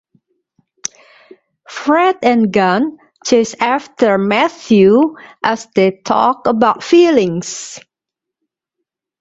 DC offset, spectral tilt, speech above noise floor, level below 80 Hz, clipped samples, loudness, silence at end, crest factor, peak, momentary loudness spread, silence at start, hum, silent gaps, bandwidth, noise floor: under 0.1%; -5 dB/octave; 70 dB; -56 dBFS; under 0.1%; -13 LUFS; 1.4 s; 14 dB; 0 dBFS; 16 LU; 0.85 s; none; none; 8 kHz; -83 dBFS